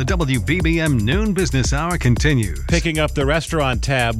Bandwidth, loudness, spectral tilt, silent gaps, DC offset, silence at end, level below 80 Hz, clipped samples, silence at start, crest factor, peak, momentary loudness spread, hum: 14.5 kHz; -18 LUFS; -5.5 dB/octave; none; under 0.1%; 0 s; -26 dBFS; under 0.1%; 0 s; 14 dB; -4 dBFS; 3 LU; none